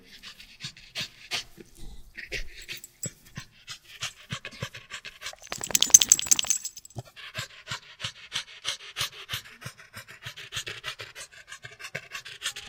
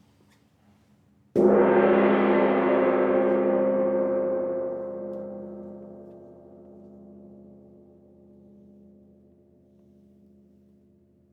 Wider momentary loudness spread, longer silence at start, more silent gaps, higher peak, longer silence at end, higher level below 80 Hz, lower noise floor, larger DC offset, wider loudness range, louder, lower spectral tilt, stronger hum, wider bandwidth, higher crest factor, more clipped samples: about the same, 22 LU vs 22 LU; second, 0.1 s vs 1.35 s; neither; first, 0 dBFS vs -8 dBFS; second, 0 s vs 4.2 s; first, -54 dBFS vs -64 dBFS; second, -48 dBFS vs -61 dBFS; neither; second, 16 LU vs 20 LU; second, -26 LUFS vs -23 LUFS; second, 0.5 dB/octave vs -9 dB/octave; neither; first, 19 kHz vs 4.4 kHz; first, 32 dB vs 18 dB; neither